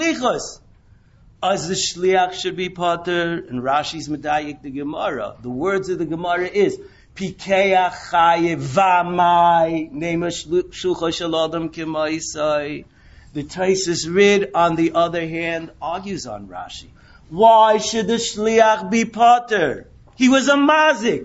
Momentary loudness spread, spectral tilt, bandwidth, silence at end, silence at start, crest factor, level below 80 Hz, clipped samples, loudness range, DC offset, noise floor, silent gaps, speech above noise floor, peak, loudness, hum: 15 LU; -4 dB/octave; 8 kHz; 0 s; 0 s; 18 dB; -50 dBFS; under 0.1%; 7 LU; under 0.1%; -51 dBFS; none; 32 dB; -2 dBFS; -18 LUFS; none